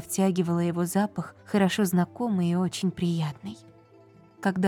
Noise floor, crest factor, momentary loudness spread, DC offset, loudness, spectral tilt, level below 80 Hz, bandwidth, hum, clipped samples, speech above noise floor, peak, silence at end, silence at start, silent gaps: -54 dBFS; 16 dB; 10 LU; under 0.1%; -27 LUFS; -6 dB/octave; -66 dBFS; 17.5 kHz; none; under 0.1%; 28 dB; -12 dBFS; 0 s; 0 s; none